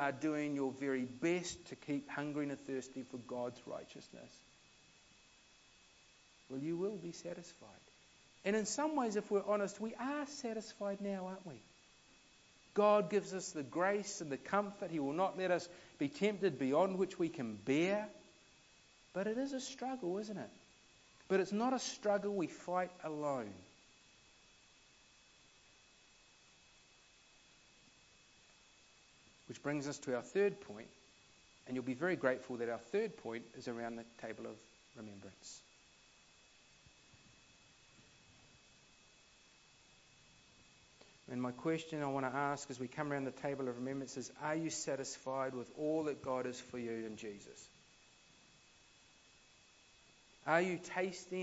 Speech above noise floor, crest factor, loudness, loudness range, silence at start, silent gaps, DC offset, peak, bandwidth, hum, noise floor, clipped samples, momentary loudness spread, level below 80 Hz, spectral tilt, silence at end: 27 dB; 24 dB; -40 LUFS; 13 LU; 0 s; none; under 0.1%; -18 dBFS; 7.6 kHz; none; -67 dBFS; under 0.1%; 17 LU; -78 dBFS; -4.5 dB/octave; 0 s